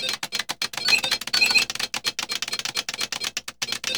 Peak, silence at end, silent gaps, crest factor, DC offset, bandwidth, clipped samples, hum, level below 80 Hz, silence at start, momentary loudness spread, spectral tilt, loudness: -6 dBFS; 0 s; none; 20 dB; 0.1%; over 20 kHz; under 0.1%; 60 Hz at -55 dBFS; -62 dBFS; 0 s; 10 LU; 1 dB/octave; -23 LUFS